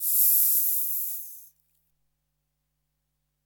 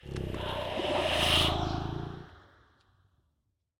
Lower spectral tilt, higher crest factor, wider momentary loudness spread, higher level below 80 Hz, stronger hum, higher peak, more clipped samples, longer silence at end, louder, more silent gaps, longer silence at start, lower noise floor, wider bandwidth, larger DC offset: second, 5.5 dB/octave vs -4 dB/octave; about the same, 22 dB vs 20 dB; about the same, 16 LU vs 15 LU; second, -82 dBFS vs -46 dBFS; neither; first, -6 dBFS vs -14 dBFS; neither; first, 2 s vs 1.4 s; first, -21 LUFS vs -29 LUFS; neither; about the same, 0 s vs 0.05 s; about the same, -78 dBFS vs -78 dBFS; about the same, 17.5 kHz vs 19 kHz; neither